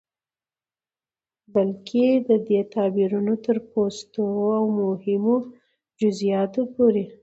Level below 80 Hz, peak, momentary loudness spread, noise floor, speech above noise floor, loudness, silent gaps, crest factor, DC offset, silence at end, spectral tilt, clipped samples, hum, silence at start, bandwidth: -68 dBFS; -8 dBFS; 5 LU; under -90 dBFS; over 68 dB; -23 LUFS; none; 16 dB; under 0.1%; 0.1 s; -7.5 dB/octave; under 0.1%; none; 1.55 s; 8 kHz